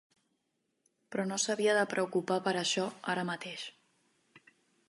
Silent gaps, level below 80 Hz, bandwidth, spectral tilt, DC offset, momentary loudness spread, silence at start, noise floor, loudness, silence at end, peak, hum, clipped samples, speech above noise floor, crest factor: none; -86 dBFS; 11.5 kHz; -3 dB/octave; under 0.1%; 12 LU; 1.1 s; -81 dBFS; -32 LUFS; 0.5 s; -16 dBFS; none; under 0.1%; 48 dB; 20 dB